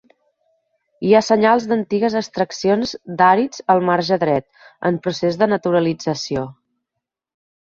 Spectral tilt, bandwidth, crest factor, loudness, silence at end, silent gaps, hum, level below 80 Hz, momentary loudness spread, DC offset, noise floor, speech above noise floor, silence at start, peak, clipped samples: -5.5 dB/octave; 7.8 kHz; 18 dB; -18 LUFS; 1.25 s; none; none; -58 dBFS; 9 LU; under 0.1%; -81 dBFS; 64 dB; 1 s; -2 dBFS; under 0.1%